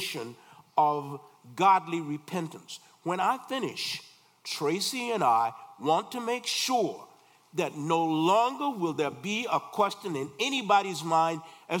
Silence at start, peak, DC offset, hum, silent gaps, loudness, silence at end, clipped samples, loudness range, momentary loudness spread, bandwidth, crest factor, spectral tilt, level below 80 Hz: 0 s; -10 dBFS; under 0.1%; none; none; -28 LUFS; 0 s; under 0.1%; 2 LU; 14 LU; 18 kHz; 18 dB; -4 dB/octave; -84 dBFS